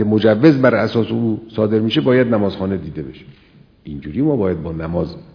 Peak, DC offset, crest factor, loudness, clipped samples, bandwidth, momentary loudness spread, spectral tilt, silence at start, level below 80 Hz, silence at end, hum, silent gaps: 0 dBFS; under 0.1%; 16 dB; -17 LUFS; under 0.1%; 5.4 kHz; 16 LU; -9 dB/octave; 0 s; -44 dBFS; 0.15 s; none; none